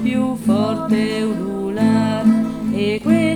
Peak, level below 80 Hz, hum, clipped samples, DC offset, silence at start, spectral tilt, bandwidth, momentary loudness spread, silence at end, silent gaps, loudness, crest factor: -2 dBFS; -48 dBFS; none; under 0.1%; under 0.1%; 0 s; -6.5 dB/octave; 12.5 kHz; 5 LU; 0 s; none; -18 LUFS; 14 dB